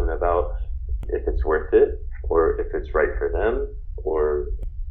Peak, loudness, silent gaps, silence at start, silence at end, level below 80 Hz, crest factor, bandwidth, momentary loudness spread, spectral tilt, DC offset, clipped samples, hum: -6 dBFS; -24 LUFS; none; 0 s; 0 s; -28 dBFS; 16 dB; 3.8 kHz; 13 LU; -10.5 dB/octave; under 0.1%; under 0.1%; none